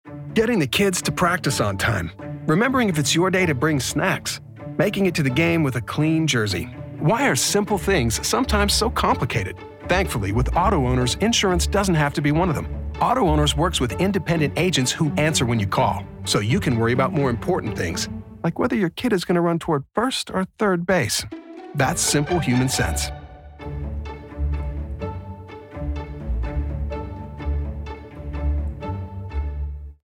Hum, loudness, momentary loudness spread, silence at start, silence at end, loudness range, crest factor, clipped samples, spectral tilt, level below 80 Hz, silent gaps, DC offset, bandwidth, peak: none; -22 LUFS; 13 LU; 0.05 s; 0.15 s; 9 LU; 12 dB; under 0.1%; -4.5 dB/octave; -34 dBFS; none; under 0.1%; 17.5 kHz; -8 dBFS